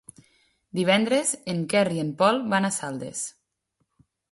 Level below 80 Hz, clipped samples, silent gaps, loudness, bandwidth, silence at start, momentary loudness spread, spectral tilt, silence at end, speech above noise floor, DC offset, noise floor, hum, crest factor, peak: -68 dBFS; under 0.1%; none; -24 LUFS; 11.5 kHz; 0.75 s; 11 LU; -4 dB/octave; 1 s; 52 dB; under 0.1%; -76 dBFS; none; 20 dB; -6 dBFS